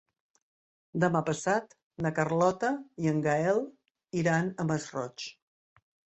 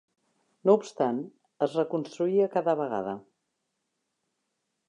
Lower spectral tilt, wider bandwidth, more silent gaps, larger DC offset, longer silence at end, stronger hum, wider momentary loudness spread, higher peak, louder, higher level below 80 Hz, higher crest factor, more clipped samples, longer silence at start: about the same, -6 dB/octave vs -7 dB/octave; second, 8.6 kHz vs 10 kHz; first, 1.83-1.91 s vs none; neither; second, 0.85 s vs 1.7 s; neither; about the same, 11 LU vs 12 LU; about the same, -12 dBFS vs -10 dBFS; about the same, -30 LUFS vs -28 LUFS; first, -68 dBFS vs -80 dBFS; about the same, 20 dB vs 20 dB; neither; first, 0.95 s vs 0.65 s